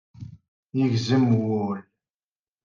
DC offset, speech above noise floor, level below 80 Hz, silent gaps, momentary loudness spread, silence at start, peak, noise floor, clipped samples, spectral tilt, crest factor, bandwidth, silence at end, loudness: under 0.1%; over 68 dB; -66 dBFS; 0.48-0.68 s; 23 LU; 0.2 s; -10 dBFS; under -90 dBFS; under 0.1%; -7.5 dB/octave; 16 dB; 7.4 kHz; 0.85 s; -24 LUFS